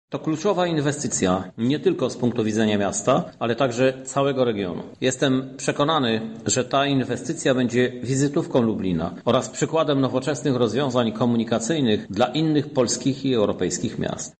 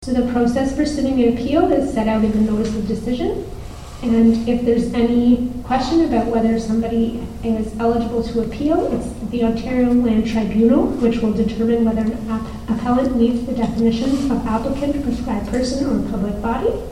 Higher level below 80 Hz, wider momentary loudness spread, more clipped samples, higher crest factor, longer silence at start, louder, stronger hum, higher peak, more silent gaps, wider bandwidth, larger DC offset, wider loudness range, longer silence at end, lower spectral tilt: second, -56 dBFS vs -34 dBFS; second, 4 LU vs 7 LU; neither; about the same, 16 dB vs 16 dB; about the same, 0.1 s vs 0 s; second, -22 LUFS vs -18 LUFS; neither; second, -6 dBFS vs -2 dBFS; neither; second, 9 kHz vs 12 kHz; neither; about the same, 1 LU vs 3 LU; about the same, 0.1 s vs 0 s; second, -5 dB/octave vs -7 dB/octave